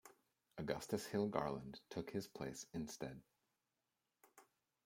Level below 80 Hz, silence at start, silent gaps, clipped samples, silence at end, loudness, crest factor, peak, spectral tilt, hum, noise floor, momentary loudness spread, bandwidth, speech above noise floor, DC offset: -74 dBFS; 0.05 s; none; under 0.1%; 0.4 s; -46 LUFS; 26 dB; -22 dBFS; -5 dB/octave; none; -90 dBFS; 11 LU; 16.5 kHz; 45 dB; under 0.1%